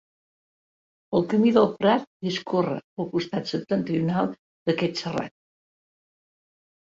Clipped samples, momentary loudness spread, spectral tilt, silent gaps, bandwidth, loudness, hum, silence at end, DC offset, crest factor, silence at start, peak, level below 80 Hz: under 0.1%; 10 LU; -7 dB/octave; 2.07-2.20 s, 2.84-2.97 s, 4.39-4.66 s; 7.8 kHz; -25 LUFS; none; 1.55 s; under 0.1%; 20 dB; 1.1 s; -6 dBFS; -64 dBFS